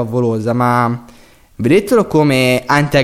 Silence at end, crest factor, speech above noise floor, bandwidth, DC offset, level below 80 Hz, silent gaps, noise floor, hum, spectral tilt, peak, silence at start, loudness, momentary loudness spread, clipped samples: 0 s; 12 dB; 31 dB; 16 kHz; under 0.1%; -44 dBFS; none; -44 dBFS; none; -6 dB/octave; 0 dBFS; 0 s; -14 LUFS; 7 LU; under 0.1%